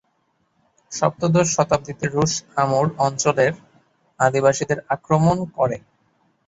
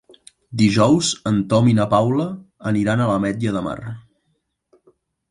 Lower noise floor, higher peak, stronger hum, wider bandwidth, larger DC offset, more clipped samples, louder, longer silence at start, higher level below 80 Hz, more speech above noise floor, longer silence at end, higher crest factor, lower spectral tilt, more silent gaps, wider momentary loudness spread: about the same, -67 dBFS vs -70 dBFS; about the same, -2 dBFS vs -2 dBFS; neither; second, 8.2 kHz vs 11.5 kHz; neither; neither; about the same, -20 LUFS vs -19 LUFS; first, 0.9 s vs 0.5 s; about the same, -52 dBFS vs -50 dBFS; second, 48 dB vs 52 dB; second, 0.7 s vs 1.3 s; about the same, 18 dB vs 18 dB; about the same, -5 dB/octave vs -6 dB/octave; neither; second, 6 LU vs 14 LU